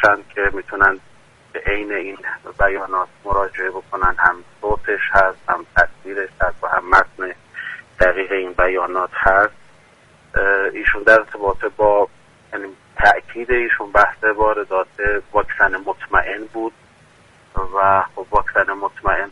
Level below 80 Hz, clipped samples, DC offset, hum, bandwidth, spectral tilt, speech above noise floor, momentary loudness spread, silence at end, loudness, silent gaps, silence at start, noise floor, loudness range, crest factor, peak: -36 dBFS; under 0.1%; under 0.1%; none; 11 kHz; -5.5 dB/octave; 32 dB; 13 LU; 0 s; -18 LUFS; none; 0 s; -50 dBFS; 3 LU; 18 dB; 0 dBFS